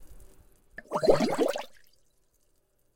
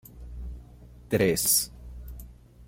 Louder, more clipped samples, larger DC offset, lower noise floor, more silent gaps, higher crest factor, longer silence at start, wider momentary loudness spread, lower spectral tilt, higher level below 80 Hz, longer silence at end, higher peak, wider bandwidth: second, -27 LUFS vs -24 LUFS; neither; neither; first, -69 dBFS vs -49 dBFS; neither; about the same, 24 dB vs 22 dB; about the same, 0 s vs 0.1 s; about the same, 24 LU vs 23 LU; first, -5 dB/octave vs -3 dB/octave; second, -52 dBFS vs -44 dBFS; first, 1.25 s vs 0 s; about the same, -8 dBFS vs -10 dBFS; about the same, 16.5 kHz vs 16.5 kHz